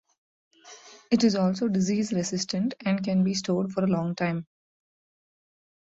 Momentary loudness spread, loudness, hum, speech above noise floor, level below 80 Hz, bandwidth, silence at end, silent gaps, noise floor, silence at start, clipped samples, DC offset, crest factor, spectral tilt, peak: 6 LU; -26 LUFS; none; 24 dB; -66 dBFS; 8 kHz; 1.55 s; none; -50 dBFS; 0.65 s; under 0.1%; under 0.1%; 18 dB; -5.5 dB/octave; -10 dBFS